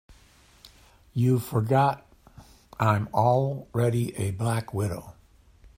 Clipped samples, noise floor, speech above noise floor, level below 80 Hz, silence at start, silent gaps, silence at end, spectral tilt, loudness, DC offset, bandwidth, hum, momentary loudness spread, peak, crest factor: under 0.1%; -57 dBFS; 32 dB; -56 dBFS; 0.65 s; none; 0.1 s; -7 dB/octave; -26 LUFS; under 0.1%; 16 kHz; none; 10 LU; -6 dBFS; 20 dB